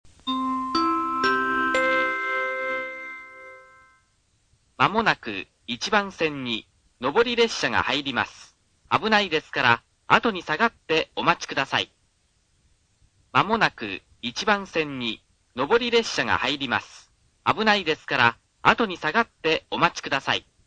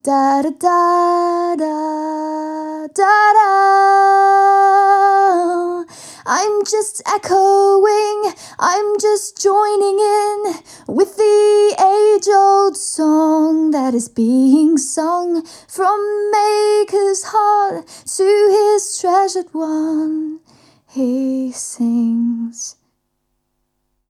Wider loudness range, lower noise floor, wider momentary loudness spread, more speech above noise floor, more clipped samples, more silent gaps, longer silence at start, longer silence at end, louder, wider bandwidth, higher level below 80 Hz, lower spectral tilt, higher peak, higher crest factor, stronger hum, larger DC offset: second, 4 LU vs 7 LU; about the same, -66 dBFS vs -69 dBFS; about the same, 11 LU vs 12 LU; second, 43 dB vs 55 dB; neither; neither; about the same, 0.05 s vs 0.05 s; second, 0.25 s vs 1.4 s; second, -23 LUFS vs -14 LUFS; second, 9.8 kHz vs 14 kHz; first, -58 dBFS vs -68 dBFS; about the same, -3.5 dB/octave vs -3 dB/octave; about the same, 0 dBFS vs -2 dBFS; first, 24 dB vs 14 dB; neither; neither